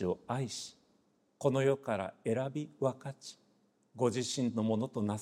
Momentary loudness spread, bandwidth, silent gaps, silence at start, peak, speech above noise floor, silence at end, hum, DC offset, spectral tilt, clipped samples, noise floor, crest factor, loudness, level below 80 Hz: 14 LU; 14.5 kHz; none; 0 s; -16 dBFS; 38 dB; 0 s; none; under 0.1%; -5.5 dB/octave; under 0.1%; -72 dBFS; 20 dB; -35 LUFS; -74 dBFS